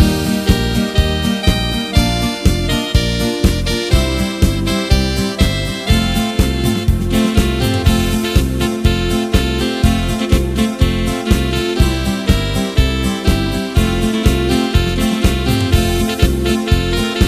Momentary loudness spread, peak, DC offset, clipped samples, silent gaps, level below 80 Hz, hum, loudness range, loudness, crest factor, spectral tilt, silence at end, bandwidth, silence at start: 2 LU; 0 dBFS; under 0.1%; under 0.1%; none; -20 dBFS; none; 1 LU; -15 LUFS; 14 dB; -5.5 dB/octave; 0 s; 15.5 kHz; 0 s